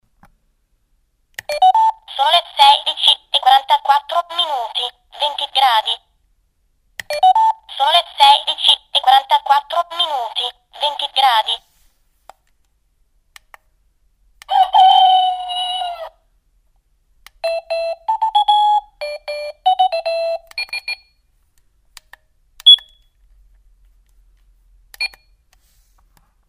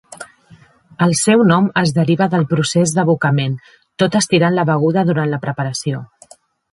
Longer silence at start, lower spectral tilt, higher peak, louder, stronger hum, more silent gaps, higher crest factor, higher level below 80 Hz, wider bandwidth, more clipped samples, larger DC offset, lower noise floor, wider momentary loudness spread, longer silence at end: first, 1.5 s vs 0.1 s; second, 1.5 dB/octave vs -5.5 dB/octave; about the same, 0 dBFS vs 0 dBFS; about the same, -15 LUFS vs -15 LUFS; neither; neither; about the same, 18 dB vs 16 dB; about the same, -58 dBFS vs -56 dBFS; first, 15.5 kHz vs 11.5 kHz; neither; neither; first, -62 dBFS vs -47 dBFS; first, 15 LU vs 11 LU; first, 1.4 s vs 0.7 s